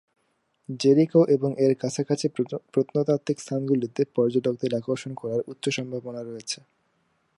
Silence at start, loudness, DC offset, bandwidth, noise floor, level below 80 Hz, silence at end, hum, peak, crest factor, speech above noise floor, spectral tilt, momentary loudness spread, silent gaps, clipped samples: 0.7 s; -25 LUFS; under 0.1%; 11.5 kHz; -71 dBFS; -74 dBFS; 0.85 s; none; -8 dBFS; 18 dB; 47 dB; -6 dB/octave; 13 LU; none; under 0.1%